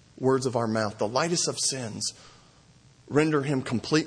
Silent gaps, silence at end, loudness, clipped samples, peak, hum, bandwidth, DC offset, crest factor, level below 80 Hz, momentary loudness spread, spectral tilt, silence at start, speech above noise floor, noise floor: none; 0 s; -27 LUFS; under 0.1%; -8 dBFS; none; 10.5 kHz; under 0.1%; 18 dB; -64 dBFS; 6 LU; -4 dB/octave; 0.2 s; 30 dB; -56 dBFS